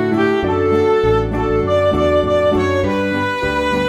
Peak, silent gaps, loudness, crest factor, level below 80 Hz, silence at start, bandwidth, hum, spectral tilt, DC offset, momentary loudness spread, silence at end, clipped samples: -4 dBFS; none; -16 LUFS; 12 dB; -32 dBFS; 0 s; 14 kHz; none; -7 dB/octave; under 0.1%; 4 LU; 0 s; under 0.1%